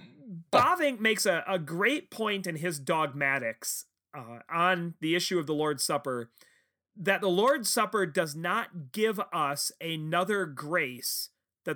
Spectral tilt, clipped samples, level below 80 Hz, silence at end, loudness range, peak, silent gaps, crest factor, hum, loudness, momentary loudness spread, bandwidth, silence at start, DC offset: -3.5 dB/octave; under 0.1%; -78 dBFS; 0 s; 3 LU; -10 dBFS; none; 20 dB; none; -29 LUFS; 12 LU; over 20 kHz; 0 s; under 0.1%